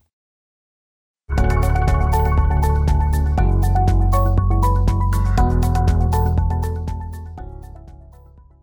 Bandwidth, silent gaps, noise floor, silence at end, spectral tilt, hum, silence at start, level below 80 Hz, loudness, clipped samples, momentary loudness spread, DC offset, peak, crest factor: 20 kHz; none; -45 dBFS; 0.7 s; -7.5 dB/octave; none; 1.3 s; -20 dBFS; -19 LUFS; under 0.1%; 12 LU; under 0.1%; -6 dBFS; 12 dB